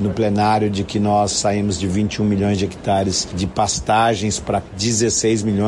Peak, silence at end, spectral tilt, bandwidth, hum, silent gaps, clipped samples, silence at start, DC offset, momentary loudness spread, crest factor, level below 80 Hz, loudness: -6 dBFS; 0 s; -4.5 dB/octave; 11.5 kHz; none; none; under 0.1%; 0 s; under 0.1%; 4 LU; 12 dB; -42 dBFS; -18 LUFS